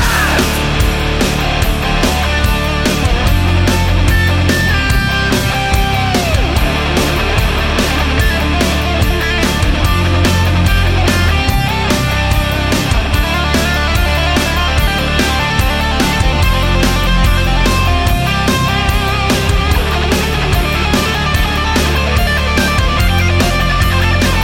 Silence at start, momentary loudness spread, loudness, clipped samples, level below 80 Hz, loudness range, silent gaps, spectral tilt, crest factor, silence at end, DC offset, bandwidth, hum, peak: 0 s; 2 LU; -13 LUFS; under 0.1%; -16 dBFS; 1 LU; none; -4.5 dB/octave; 12 dB; 0 s; under 0.1%; 17 kHz; none; 0 dBFS